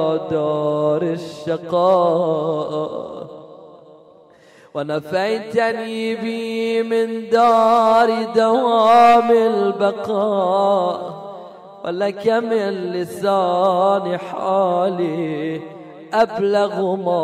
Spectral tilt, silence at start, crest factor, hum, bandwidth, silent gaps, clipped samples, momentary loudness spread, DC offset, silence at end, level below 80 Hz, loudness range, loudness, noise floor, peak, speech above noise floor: -6 dB/octave; 0 s; 14 dB; none; 13.5 kHz; none; under 0.1%; 14 LU; under 0.1%; 0 s; -64 dBFS; 9 LU; -18 LUFS; -48 dBFS; -4 dBFS; 31 dB